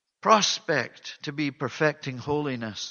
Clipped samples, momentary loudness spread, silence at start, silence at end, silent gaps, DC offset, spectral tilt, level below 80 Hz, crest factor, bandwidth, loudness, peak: under 0.1%; 14 LU; 0.25 s; 0 s; none; under 0.1%; -3.5 dB/octave; -64 dBFS; 22 dB; 7.2 kHz; -26 LUFS; -4 dBFS